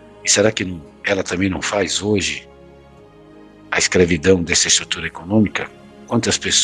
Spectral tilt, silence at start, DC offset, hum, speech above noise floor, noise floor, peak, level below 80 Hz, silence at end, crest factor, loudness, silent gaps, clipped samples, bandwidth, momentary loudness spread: -3 dB/octave; 0.2 s; under 0.1%; none; 26 dB; -44 dBFS; 0 dBFS; -44 dBFS; 0 s; 18 dB; -17 LUFS; none; under 0.1%; 12 kHz; 10 LU